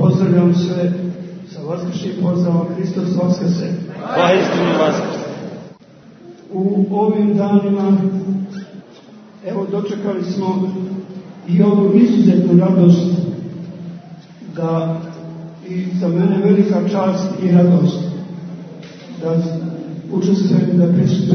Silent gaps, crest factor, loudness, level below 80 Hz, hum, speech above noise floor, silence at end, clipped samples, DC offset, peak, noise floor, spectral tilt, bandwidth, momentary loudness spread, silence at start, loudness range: none; 16 dB; -16 LUFS; -60 dBFS; none; 28 dB; 0 s; under 0.1%; under 0.1%; 0 dBFS; -42 dBFS; -8.5 dB/octave; 6.4 kHz; 20 LU; 0 s; 6 LU